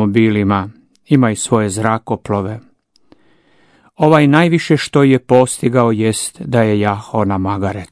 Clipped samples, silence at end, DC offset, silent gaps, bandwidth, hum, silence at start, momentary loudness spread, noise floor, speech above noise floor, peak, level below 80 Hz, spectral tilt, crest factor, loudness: 0.2%; 0.05 s; under 0.1%; none; 11 kHz; none; 0 s; 9 LU; -52 dBFS; 38 dB; 0 dBFS; -52 dBFS; -6 dB/octave; 14 dB; -14 LUFS